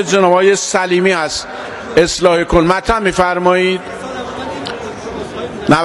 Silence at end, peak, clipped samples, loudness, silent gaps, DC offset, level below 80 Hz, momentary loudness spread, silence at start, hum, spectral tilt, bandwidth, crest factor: 0 s; 0 dBFS; 0.3%; -14 LUFS; none; under 0.1%; -36 dBFS; 14 LU; 0 s; none; -4 dB/octave; 12 kHz; 14 dB